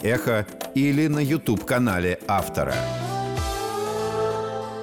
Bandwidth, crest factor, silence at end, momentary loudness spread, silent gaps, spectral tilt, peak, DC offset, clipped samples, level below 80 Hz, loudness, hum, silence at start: 19.5 kHz; 12 dB; 0 s; 6 LU; none; -6 dB/octave; -12 dBFS; 0.1%; under 0.1%; -42 dBFS; -24 LUFS; none; 0 s